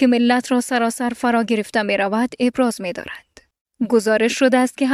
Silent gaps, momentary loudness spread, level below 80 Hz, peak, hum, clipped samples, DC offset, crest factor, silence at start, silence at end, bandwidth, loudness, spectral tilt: 3.61-3.66 s; 11 LU; -60 dBFS; -4 dBFS; none; under 0.1%; under 0.1%; 16 dB; 0 s; 0 s; 14 kHz; -18 LUFS; -4 dB/octave